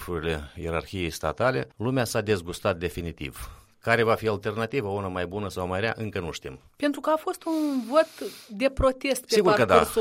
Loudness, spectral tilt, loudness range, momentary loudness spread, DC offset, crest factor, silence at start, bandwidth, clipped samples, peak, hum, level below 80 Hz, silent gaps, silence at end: -26 LUFS; -5 dB/octave; 4 LU; 13 LU; under 0.1%; 24 dB; 0 s; 16 kHz; under 0.1%; -2 dBFS; none; -46 dBFS; none; 0 s